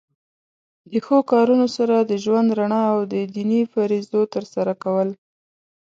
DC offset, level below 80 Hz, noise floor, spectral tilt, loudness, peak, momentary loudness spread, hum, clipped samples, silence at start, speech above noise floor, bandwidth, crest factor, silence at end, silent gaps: under 0.1%; -70 dBFS; under -90 dBFS; -7 dB/octave; -20 LUFS; -4 dBFS; 8 LU; none; under 0.1%; 0.9 s; over 71 dB; 7.6 kHz; 16 dB; 0.7 s; none